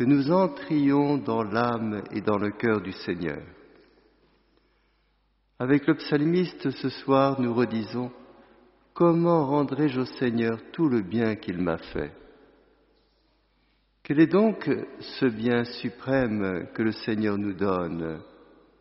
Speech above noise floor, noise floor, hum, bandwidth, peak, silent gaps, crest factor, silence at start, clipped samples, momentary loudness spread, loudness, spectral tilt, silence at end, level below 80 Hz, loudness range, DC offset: 43 dB; -68 dBFS; none; 6 kHz; -6 dBFS; none; 20 dB; 0 s; under 0.1%; 11 LU; -26 LUFS; -6 dB/octave; 0.55 s; -58 dBFS; 6 LU; under 0.1%